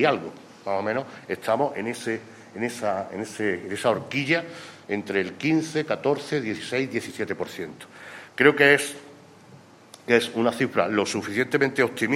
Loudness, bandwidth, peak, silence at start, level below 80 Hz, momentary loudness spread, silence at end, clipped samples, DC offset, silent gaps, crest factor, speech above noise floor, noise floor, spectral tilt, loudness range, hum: -25 LUFS; 16 kHz; -2 dBFS; 0 s; -70 dBFS; 17 LU; 0 s; under 0.1%; under 0.1%; none; 24 dB; 25 dB; -50 dBFS; -4.5 dB/octave; 5 LU; none